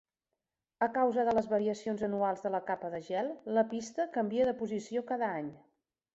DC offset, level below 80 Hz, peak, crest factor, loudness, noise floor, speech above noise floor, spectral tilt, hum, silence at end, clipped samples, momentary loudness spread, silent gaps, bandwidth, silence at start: under 0.1%; -72 dBFS; -16 dBFS; 18 dB; -33 LUFS; -89 dBFS; 56 dB; -6 dB/octave; none; 0.55 s; under 0.1%; 7 LU; none; 8 kHz; 0.8 s